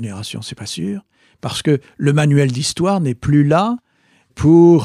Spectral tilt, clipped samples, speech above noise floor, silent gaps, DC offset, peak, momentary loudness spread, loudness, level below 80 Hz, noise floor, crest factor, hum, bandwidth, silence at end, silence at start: -6.5 dB/octave; under 0.1%; 42 dB; none; under 0.1%; -2 dBFS; 15 LU; -16 LUFS; -44 dBFS; -57 dBFS; 14 dB; none; 13 kHz; 0 s; 0 s